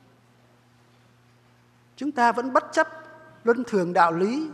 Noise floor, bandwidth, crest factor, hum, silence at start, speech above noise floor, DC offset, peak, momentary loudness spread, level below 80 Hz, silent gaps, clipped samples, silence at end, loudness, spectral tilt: -58 dBFS; 12.5 kHz; 22 dB; none; 2 s; 36 dB; under 0.1%; -4 dBFS; 10 LU; -76 dBFS; none; under 0.1%; 0 s; -23 LUFS; -5.5 dB/octave